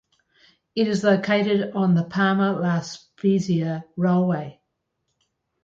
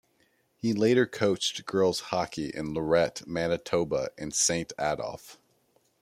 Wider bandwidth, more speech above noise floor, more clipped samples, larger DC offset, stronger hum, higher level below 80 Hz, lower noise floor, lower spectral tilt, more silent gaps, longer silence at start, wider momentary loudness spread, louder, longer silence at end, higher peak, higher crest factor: second, 7.8 kHz vs 15.5 kHz; first, 55 dB vs 41 dB; neither; neither; neither; about the same, -64 dBFS vs -60 dBFS; first, -76 dBFS vs -69 dBFS; first, -7 dB/octave vs -3.5 dB/octave; neither; about the same, 0.75 s vs 0.65 s; about the same, 9 LU vs 9 LU; first, -22 LUFS vs -28 LUFS; first, 1.15 s vs 0.65 s; first, -6 dBFS vs -10 dBFS; about the same, 16 dB vs 18 dB